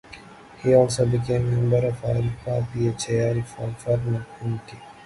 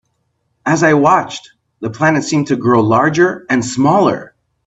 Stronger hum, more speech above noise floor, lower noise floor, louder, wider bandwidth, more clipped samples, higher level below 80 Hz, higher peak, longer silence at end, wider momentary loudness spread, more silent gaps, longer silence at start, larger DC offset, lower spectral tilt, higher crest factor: neither; second, 22 dB vs 53 dB; second, -45 dBFS vs -66 dBFS; second, -24 LUFS vs -13 LUFS; first, 11.5 kHz vs 8.4 kHz; neither; first, -46 dBFS vs -54 dBFS; second, -4 dBFS vs 0 dBFS; second, 0 s vs 0.4 s; about the same, 13 LU vs 14 LU; neither; second, 0.1 s vs 0.65 s; neither; first, -7 dB/octave vs -5.5 dB/octave; about the same, 18 dB vs 14 dB